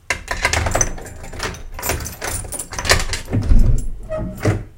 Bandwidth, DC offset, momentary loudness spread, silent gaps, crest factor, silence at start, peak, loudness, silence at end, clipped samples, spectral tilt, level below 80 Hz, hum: 17 kHz; under 0.1%; 10 LU; none; 18 dB; 0.1 s; 0 dBFS; -21 LUFS; 0 s; under 0.1%; -3.5 dB/octave; -22 dBFS; none